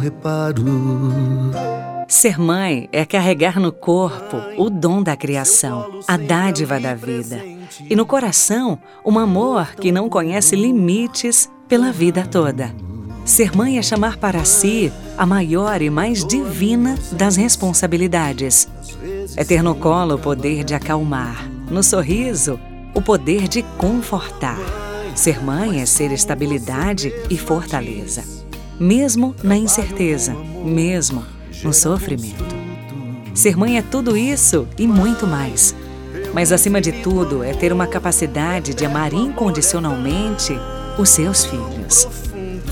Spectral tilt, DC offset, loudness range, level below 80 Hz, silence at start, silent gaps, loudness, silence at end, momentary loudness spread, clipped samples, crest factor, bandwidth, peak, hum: -4 dB/octave; under 0.1%; 3 LU; -34 dBFS; 0 s; none; -16 LUFS; 0 s; 13 LU; under 0.1%; 18 dB; 18 kHz; 0 dBFS; none